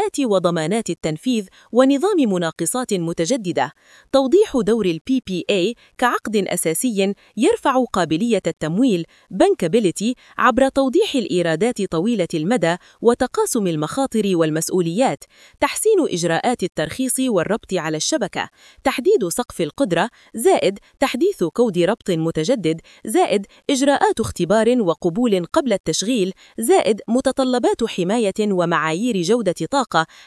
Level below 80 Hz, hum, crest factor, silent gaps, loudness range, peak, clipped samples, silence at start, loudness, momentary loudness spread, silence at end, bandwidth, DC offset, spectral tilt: -52 dBFS; none; 18 dB; 5.01-5.05 s, 25.80-25.84 s; 2 LU; 0 dBFS; under 0.1%; 0 s; -19 LUFS; 6 LU; 0.2 s; 12 kHz; under 0.1%; -4.5 dB/octave